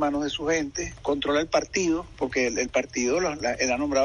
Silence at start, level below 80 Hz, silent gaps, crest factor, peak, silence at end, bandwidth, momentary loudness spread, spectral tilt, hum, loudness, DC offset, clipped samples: 0 s; -48 dBFS; none; 16 dB; -10 dBFS; 0 s; 10.5 kHz; 5 LU; -3.5 dB/octave; none; -26 LUFS; under 0.1%; under 0.1%